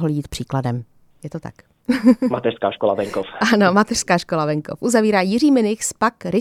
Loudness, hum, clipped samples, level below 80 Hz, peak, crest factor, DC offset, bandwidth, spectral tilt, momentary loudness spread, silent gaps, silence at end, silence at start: -18 LUFS; none; under 0.1%; -50 dBFS; -2 dBFS; 18 dB; under 0.1%; 14.5 kHz; -5 dB/octave; 17 LU; none; 0 s; 0 s